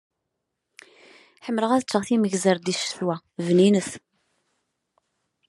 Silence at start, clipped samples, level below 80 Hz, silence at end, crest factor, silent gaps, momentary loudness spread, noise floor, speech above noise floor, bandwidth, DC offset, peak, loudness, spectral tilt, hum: 1.45 s; under 0.1%; -72 dBFS; 1.5 s; 20 dB; none; 12 LU; -80 dBFS; 58 dB; 12 kHz; under 0.1%; -6 dBFS; -23 LUFS; -5 dB/octave; none